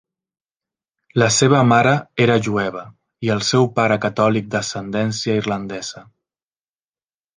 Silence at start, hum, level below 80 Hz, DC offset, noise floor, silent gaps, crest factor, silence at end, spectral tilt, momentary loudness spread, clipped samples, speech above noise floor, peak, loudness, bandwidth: 1.15 s; none; -56 dBFS; under 0.1%; under -90 dBFS; none; 18 dB; 1.35 s; -5 dB/octave; 12 LU; under 0.1%; over 72 dB; -2 dBFS; -18 LUFS; 10 kHz